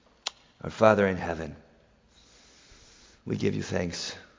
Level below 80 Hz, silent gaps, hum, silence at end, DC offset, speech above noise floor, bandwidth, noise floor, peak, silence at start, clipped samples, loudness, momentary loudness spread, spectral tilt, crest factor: -52 dBFS; none; none; 0.15 s; under 0.1%; 34 dB; 7.6 kHz; -61 dBFS; -4 dBFS; 0.25 s; under 0.1%; -28 LUFS; 19 LU; -5.5 dB/octave; 26 dB